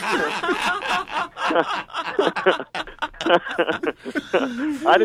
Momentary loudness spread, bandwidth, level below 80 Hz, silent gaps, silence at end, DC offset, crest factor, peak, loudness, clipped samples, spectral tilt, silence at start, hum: 7 LU; 15 kHz; -54 dBFS; none; 0 s; under 0.1%; 18 dB; -4 dBFS; -22 LUFS; under 0.1%; -3.5 dB/octave; 0 s; none